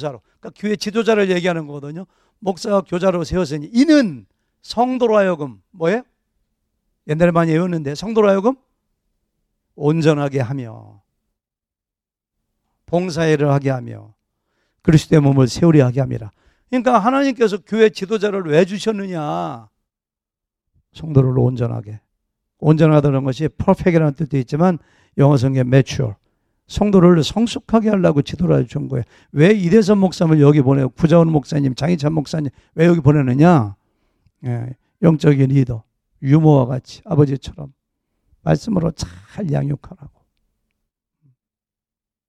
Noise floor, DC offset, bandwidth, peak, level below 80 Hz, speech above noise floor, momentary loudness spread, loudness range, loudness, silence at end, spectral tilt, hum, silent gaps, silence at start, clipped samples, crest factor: -89 dBFS; under 0.1%; 11 kHz; 0 dBFS; -44 dBFS; 73 dB; 14 LU; 8 LU; -16 LUFS; 2.2 s; -7.5 dB/octave; none; none; 0 s; under 0.1%; 16 dB